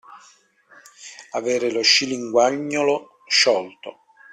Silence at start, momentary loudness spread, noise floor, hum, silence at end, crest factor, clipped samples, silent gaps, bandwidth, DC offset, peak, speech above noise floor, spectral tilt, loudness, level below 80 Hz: 0.1 s; 24 LU; -54 dBFS; none; 0.4 s; 20 dB; under 0.1%; none; 13.5 kHz; under 0.1%; -2 dBFS; 34 dB; -1.5 dB/octave; -19 LUFS; -70 dBFS